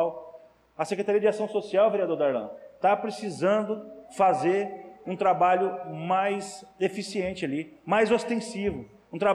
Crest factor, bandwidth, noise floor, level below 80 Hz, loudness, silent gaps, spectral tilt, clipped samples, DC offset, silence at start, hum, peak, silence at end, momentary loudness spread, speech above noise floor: 14 dB; 12 kHz; -51 dBFS; -62 dBFS; -27 LUFS; none; -5.5 dB/octave; under 0.1%; under 0.1%; 0 s; none; -12 dBFS; 0 s; 13 LU; 25 dB